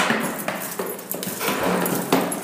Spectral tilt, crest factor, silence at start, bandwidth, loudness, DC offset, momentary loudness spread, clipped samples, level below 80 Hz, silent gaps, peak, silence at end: -3.5 dB/octave; 22 dB; 0 s; 16 kHz; -24 LUFS; under 0.1%; 7 LU; under 0.1%; -60 dBFS; none; -2 dBFS; 0 s